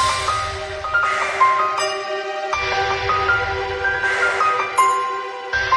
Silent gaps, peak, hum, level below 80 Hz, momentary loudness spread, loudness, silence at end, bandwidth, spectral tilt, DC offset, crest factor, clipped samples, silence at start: none; -4 dBFS; none; -42 dBFS; 8 LU; -19 LUFS; 0 s; 12 kHz; -2.5 dB/octave; under 0.1%; 16 dB; under 0.1%; 0 s